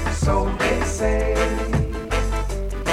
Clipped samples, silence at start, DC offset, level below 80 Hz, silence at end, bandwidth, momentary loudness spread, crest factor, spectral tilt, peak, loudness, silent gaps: under 0.1%; 0 s; under 0.1%; -24 dBFS; 0 s; 13.5 kHz; 5 LU; 14 dB; -5.5 dB/octave; -6 dBFS; -22 LUFS; none